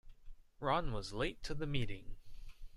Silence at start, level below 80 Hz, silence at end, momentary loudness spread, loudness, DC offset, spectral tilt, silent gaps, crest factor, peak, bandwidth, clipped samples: 0.05 s; -48 dBFS; 0 s; 22 LU; -40 LUFS; under 0.1%; -5.5 dB/octave; none; 18 dB; -20 dBFS; 11.5 kHz; under 0.1%